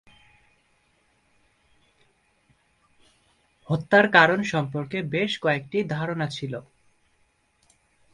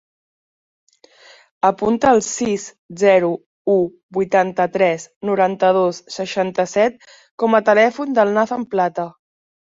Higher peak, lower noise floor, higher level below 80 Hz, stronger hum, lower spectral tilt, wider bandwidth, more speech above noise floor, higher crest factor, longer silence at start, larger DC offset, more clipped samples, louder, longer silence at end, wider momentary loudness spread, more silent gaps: about the same, 0 dBFS vs -2 dBFS; first, -67 dBFS vs -48 dBFS; about the same, -64 dBFS vs -60 dBFS; neither; about the same, -6 dB/octave vs -5 dB/octave; first, 11 kHz vs 8 kHz; first, 44 dB vs 31 dB; first, 26 dB vs 16 dB; first, 3.7 s vs 1.65 s; neither; neither; second, -23 LUFS vs -18 LUFS; first, 1.5 s vs 0.5 s; first, 13 LU vs 10 LU; second, none vs 2.79-2.89 s, 3.46-3.65 s, 4.03-4.09 s, 5.16-5.21 s, 7.31-7.38 s